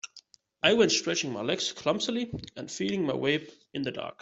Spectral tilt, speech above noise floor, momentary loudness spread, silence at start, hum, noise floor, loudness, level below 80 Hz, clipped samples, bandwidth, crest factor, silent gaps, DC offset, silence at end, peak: -3.5 dB/octave; 28 dB; 14 LU; 0.05 s; none; -57 dBFS; -28 LUFS; -64 dBFS; under 0.1%; 8.2 kHz; 22 dB; none; under 0.1%; 0.1 s; -6 dBFS